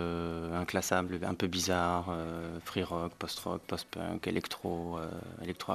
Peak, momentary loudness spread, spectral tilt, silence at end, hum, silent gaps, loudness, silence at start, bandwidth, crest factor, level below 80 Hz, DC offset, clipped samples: -12 dBFS; 9 LU; -4.5 dB/octave; 0 s; none; none; -35 LUFS; 0 s; 14.5 kHz; 22 dB; -56 dBFS; under 0.1%; under 0.1%